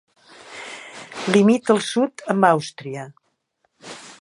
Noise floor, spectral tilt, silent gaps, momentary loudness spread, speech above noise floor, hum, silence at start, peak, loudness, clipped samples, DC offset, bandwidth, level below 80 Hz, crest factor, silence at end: -70 dBFS; -5.5 dB/octave; none; 22 LU; 51 dB; none; 0.5 s; 0 dBFS; -19 LUFS; under 0.1%; under 0.1%; 11.5 kHz; -70 dBFS; 22 dB; 0.1 s